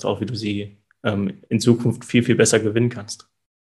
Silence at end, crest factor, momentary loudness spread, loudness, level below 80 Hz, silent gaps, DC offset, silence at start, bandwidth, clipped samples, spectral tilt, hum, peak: 0.5 s; 18 dB; 16 LU; -20 LUFS; -60 dBFS; none; under 0.1%; 0 s; 12.5 kHz; under 0.1%; -5 dB/octave; none; -2 dBFS